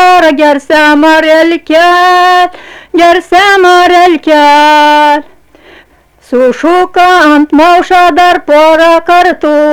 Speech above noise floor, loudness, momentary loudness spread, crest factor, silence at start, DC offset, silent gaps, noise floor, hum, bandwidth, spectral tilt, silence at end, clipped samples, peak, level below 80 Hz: 37 dB; -5 LUFS; 5 LU; 6 dB; 0 s; 0.7%; none; -42 dBFS; none; 19.5 kHz; -2.5 dB/octave; 0 s; 2%; 0 dBFS; -40 dBFS